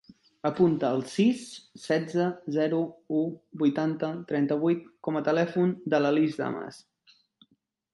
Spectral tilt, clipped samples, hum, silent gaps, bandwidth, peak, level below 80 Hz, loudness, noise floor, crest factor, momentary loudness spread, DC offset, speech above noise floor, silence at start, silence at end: -7 dB/octave; under 0.1%; none; none; 11.5 kHz; -10 dBFS; -72 dBFS; -28 LUFS; -70 dBFS; 18 dB; 9 LU; under 0.1%; 43 dB; 0.45 s; 1.15 s